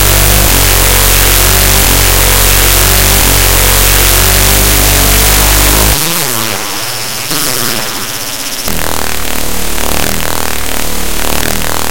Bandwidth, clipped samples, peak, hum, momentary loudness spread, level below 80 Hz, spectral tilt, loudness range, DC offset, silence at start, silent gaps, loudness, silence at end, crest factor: over 20 kHz; 2%; 0 dBFS; none; 9 LU; -14 dBFS; -2 dB/octave; 8 LU; under 0.1%; 0 s; none; -7 LUFS; 0 s; 10 dB